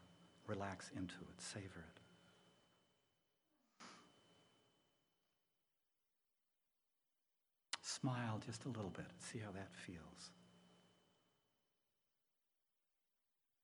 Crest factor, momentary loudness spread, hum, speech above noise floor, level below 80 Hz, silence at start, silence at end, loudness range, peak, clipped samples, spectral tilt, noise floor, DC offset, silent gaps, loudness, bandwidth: 30 dB; 20 LU; none; 39 dB; -86 dBFS; 0 s; 2.7 s; 20 LU; -26 dBFS; under 0.1%; -4.5 dB/octave; -89 dBFS; under 0.1%; none; -50 LUFS; over 20 kHz